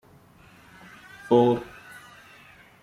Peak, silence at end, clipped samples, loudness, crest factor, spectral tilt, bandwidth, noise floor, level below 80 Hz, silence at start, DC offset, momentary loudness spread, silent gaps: -6 dBFS; 1.2 s; under 0.1%; -22 LUFS; 22 dB; -7.5 dB/octave; 14.5 kHz; -54 dBFS; -62 dBFS; 1.25 s; under 0.1%; 27 LU; none